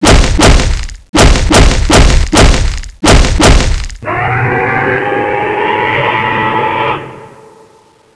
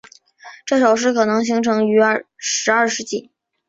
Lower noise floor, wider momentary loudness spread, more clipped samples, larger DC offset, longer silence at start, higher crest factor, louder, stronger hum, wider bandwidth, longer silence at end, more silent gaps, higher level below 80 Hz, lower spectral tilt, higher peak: about the same, -44 dBFS vs -43 dBFS; about the same, 9 LU vs 10 LU; first, 1% vs under 0.1%; neither; second, 0 s vs 0.45 s; second, 8 dB vs 16 dB; first, -10 LUFS vs -17 LUFS; neither; first, 11 kHz vs 7.8 kHz; first, 0.9 s vs 0.45 s; first, 1.09-1.13 s vs none; first, -12 dBFS vs -64 dBFS; first, -4.5 dB/octave vs -3 dB/octave; about the same, 0 dBFS vs -2 dBFS